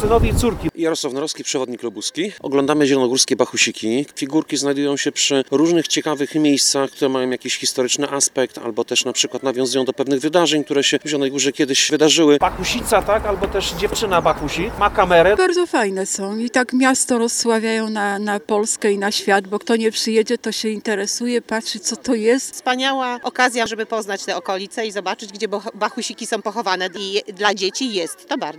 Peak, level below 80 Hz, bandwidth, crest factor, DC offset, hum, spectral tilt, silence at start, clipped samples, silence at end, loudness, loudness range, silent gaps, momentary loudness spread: 0 dBFS; -38 dBFS; 18.5 kHz; 18 dB; under 0.1%; none; -3 dB/octave; 0 s; under 0.1%; 0 s; -18 LUFS; 5 LU; none; 8 LU